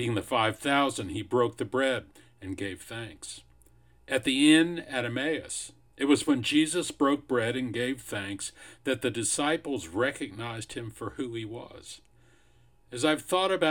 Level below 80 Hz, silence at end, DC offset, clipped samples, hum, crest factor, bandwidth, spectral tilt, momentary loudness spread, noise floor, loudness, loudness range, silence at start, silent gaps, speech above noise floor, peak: -62 dBFS; 0 s; under 0.1%; under 0.1%; none; 22 dB; 17.5 kHz; -4 dB/octave; 16 LU; -63 dBFS; -28 LUFS; 7 LU; 0 s; none; 34 dB; -8 dBFS